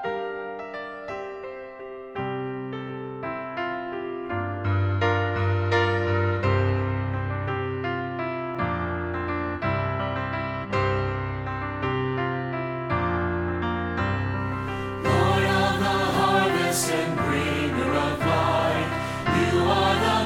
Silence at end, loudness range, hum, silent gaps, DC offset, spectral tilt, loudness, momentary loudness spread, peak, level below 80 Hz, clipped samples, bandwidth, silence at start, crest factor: 0 s; 8 LU; none; none; under 0.1%; -5.5 dB/octave; -25 LUFS; 12 LU; -8 dBFS; -46 dBFS; under 0.1%; 16 kHz; 0 s; 18 dB